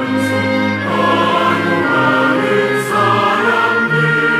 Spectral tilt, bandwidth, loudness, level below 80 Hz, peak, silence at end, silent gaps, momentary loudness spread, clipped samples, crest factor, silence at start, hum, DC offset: -5.5 dB/octave; 16 kHz; -13 LUFS; -62 dBFS; -2 dBFS; 0 s; none; 3 LU; under 0.1%; 12 dB; 0 s; none; under 0.1%